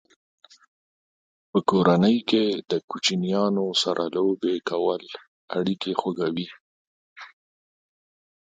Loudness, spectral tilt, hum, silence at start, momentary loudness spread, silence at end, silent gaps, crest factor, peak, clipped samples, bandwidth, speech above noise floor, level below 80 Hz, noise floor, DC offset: -24 LUFS; -5.5 dB/octave; none; 1.55 s; 15 LU; 1.2 s; 2.84-2.88 s, 5.28-5.48 s, 6.61-7.16 s; 22 dB; -4 dBFS; under 0.1%; 9.4 kHz; over 67 dB; -68 dBFS; under -90 dBFS; under 0.1%